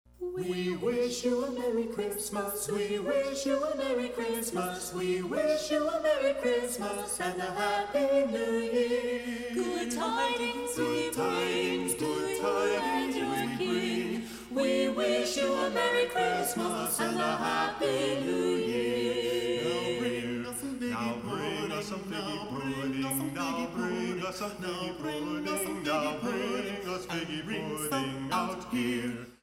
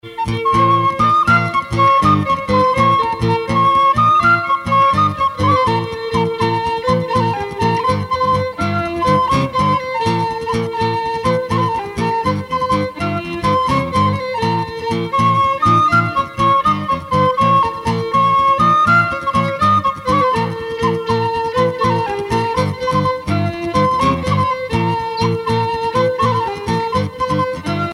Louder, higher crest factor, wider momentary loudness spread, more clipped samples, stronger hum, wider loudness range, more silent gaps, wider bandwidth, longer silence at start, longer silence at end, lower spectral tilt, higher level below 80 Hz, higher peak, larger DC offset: second, -31 LUFS vs -16 LUFS; about the same, 16 dB vs 14 dB; about the same, 7 LU vs 7 LU; neither; neither; about the same, 4 LU vs 4 LU; neither; about the same, 16 kHz vs 15 kHz; first, 0.2 s vs 0.05 s; about the same, 0.1 s vs 0 s; second, -4 dB/octave vs -6.5 dB/octave; second, -60 dBFS vs -40 dBFS; second, -14 dBFS vs -2 dBFS; neither